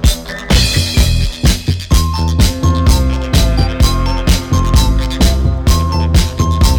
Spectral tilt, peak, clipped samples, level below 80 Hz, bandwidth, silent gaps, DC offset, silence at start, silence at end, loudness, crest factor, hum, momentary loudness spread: -5 dB/octave; -2 dBFS; under 0.1%; -14 dBFS; 19.5 kHz; none; under 0.1%; 0 s; 0 s; -13 LUFS; 10 dB; none; 3 LU